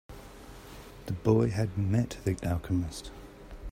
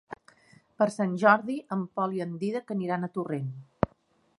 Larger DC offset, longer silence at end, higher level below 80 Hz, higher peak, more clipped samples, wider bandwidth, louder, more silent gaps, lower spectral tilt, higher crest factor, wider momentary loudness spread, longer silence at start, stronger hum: neither; second, 0 s vs 0.5 s; first, -48 dBFS vs -58 dBFS; second, -12 dBFS vs -4 dBFS; neither; first, 16 kHz vs 11.5 kHz; about the same, -30 LUFS vs -29 LUFS; neither; about the same, -7.5 dB/octave vs -7 dB/octave; second, 20 dB vs 26 dB; first, 22 LU vs 12 LU; about the same, 0.1 s vs 0.1 s; neither